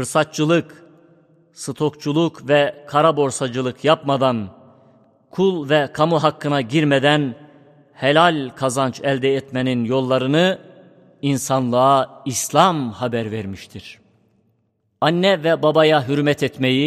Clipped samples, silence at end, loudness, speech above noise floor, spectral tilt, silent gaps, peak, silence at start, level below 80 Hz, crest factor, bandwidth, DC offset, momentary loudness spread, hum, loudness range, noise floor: under 0.1%; 0 s; -18 LUFS; 48 dB; -5 dB/octave; none; 0 dBFS; 0 s; -62 dBFS; 18 dB; 15 kHz; under 0.1%; 10 LU; none; 2 LU; -66 dBFS